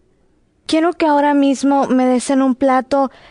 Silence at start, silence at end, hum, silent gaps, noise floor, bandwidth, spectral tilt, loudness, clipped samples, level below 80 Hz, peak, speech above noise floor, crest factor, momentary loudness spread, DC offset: 0.7 s; 0.25 s; none; none; -57 dBFS; 11 kHz; -4 dB/octave; -15 LUFS; under 0.1%; -56 dBFS; -4 dBFS; 43 dB; 12 dB; 5 LU; under 0.1%